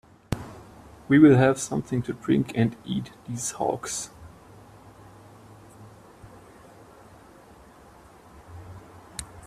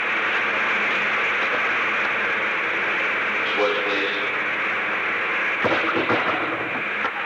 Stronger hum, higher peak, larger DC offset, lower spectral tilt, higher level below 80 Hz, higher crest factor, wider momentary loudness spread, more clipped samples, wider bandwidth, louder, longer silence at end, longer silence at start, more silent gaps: neither; first, -4 dBFS vs -8 dBFS; neither; first, -6 dB/octave vs -3.5 dB/octave; first, -54 dBFS vs -66 dBFS; first, 22 dB vs 16 dB; first, 29 LU vs 2 LU; neither; second, 14.5 kHz vs 19 kHz; second, -24 LUFS vs -21 LUFS; about the same, 0.05 s vs 0 s; first, 0.3 s vs 0 s; neither